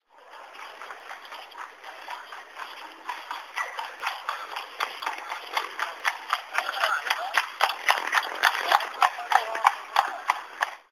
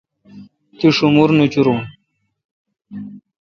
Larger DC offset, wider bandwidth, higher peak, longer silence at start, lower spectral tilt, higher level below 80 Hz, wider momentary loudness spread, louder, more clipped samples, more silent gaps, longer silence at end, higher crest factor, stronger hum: neither; first, 16 kHz vs 7.2 kHz; about the same, 0 dBFS vs 0 dBFS; second, 0.15 s vs 0.35 s; second, 2.5 dB/octave vs -7 dB/octave; second, -84 dBFS vs -56 dBFS; second, 18 LU vs 22 LU; second, -27 LUFS vs -14 LUFS; neither; second, none vs 2.45-2.65 s; second, 0.1 s vs 0.25 s; first, 28 dB vs 18 dB; neither